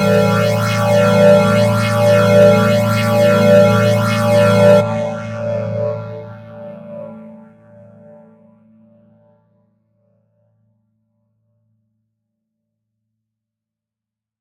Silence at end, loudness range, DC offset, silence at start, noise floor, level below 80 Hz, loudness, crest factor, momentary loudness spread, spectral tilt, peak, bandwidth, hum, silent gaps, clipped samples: 7.05 s; 16 LU; under 0.1%; 0 s; -86 dBFS; -50 dBFS; -12 LUFS; 16 dB; 22 LU; -6.5 dB/octave; 0 dBFS; 16.5 kHz; none; none; under 0.1%